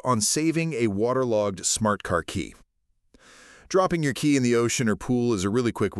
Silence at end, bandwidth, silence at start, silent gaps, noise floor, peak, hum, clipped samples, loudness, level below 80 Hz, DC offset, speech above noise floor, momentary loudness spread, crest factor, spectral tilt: 0 s; 13.5 kHz; 0.05 s; none; -70 dBFS; -8 dBFS; none; under 0.1%; -24 LUFS; -52 dBFS; under 0.1%; 46 dB; 5 LU; 16 dB; -4.5 dB/octave